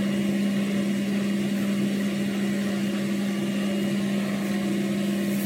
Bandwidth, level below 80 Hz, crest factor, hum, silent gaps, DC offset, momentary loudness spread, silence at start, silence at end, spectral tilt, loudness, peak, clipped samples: 16 kHz; -64 dBFS; 12 dB; none; none; under 0.1%; 2 LU; 0 s; 0 s; -6 dB/octave; -26 LUFS; -14 dBFS; under 0.1%